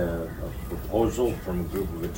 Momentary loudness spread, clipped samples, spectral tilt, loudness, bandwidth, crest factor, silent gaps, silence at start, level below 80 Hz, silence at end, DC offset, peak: 10 LU; under 0.1%; -7 dB/octave; -29 LUFS; 16.5 kHz; 16 dB; none; 0 s; -38 dBFS; 0 s; under 0.1%; -12 dBFS